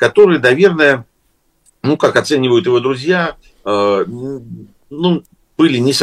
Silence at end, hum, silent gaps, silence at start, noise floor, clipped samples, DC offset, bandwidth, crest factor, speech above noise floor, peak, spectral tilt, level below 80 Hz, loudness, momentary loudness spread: 0 s; none; none; 0 s; -60 dBFS; under 0.1%; under 0.1%; 13 kHz; 14 dB; 47 dB; 0 dBFS; -5.5 dB/octave; -54 dBFS; -13 LUFS; 16 LU